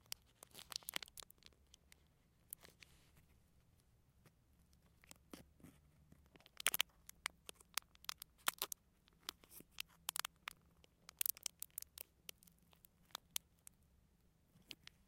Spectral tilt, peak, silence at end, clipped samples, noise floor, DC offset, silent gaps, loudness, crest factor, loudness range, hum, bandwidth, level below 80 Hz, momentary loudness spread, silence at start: 0.5 dB/octave; -12 dBFS; 0.35 s; under 0.1%; -75 dBFS; under 0.1%; none; -46 LUFS; 42 dB; 19 LU; none; 17 kHz; -76 dBFS; 24 LU; 0.55 s